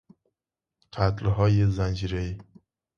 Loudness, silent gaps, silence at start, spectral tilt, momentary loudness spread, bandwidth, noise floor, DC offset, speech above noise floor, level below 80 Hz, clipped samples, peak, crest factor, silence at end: -26 LUFS; none; 0.95 s; -8 dB/octave; 15 LU; 7 kHz; -88 dBFS; under 0.1%; 64 dB; -40 dBFS; under 0.1%; -8 dBFS; 20 dB; 0.55 s